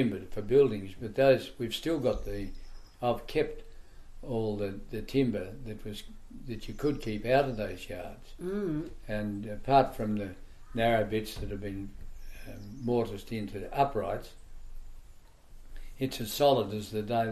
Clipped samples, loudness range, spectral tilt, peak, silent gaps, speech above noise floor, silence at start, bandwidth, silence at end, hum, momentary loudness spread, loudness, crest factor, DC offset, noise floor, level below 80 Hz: under 0.1%; 4 LU; -6 dB/octave; -10 dBFS; none; 21 dB; 0 s; 14 kHz; 0 s; none; 19 LU; -31 LUFS; 20 dB; under 0.1%; -52 dBFS; -48 dBFS